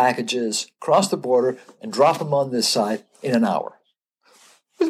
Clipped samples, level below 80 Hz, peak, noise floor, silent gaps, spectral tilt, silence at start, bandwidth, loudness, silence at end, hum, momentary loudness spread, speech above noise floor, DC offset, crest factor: under 0.1%; -78 dBFS; -2 dBFS; -67 dBFS; none; -4 dB/octave; 0 s; 15 kHz; -21 LUFS; 0 s; none; 9 LU; 46 dB; under 0.1%; 18 dB